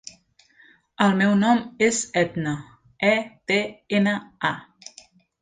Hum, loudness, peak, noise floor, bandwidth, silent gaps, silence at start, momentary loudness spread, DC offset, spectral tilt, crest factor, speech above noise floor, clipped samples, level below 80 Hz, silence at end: none; -22 LUFS; -2 dBFS; -57 dBFS; 9.4 kHz; none; 1 s; 16 LU; under 0.1%; -4.5 dB/octave; 22 dB; 35 dB; under 0.1%; -62 dBFS; 0.8 s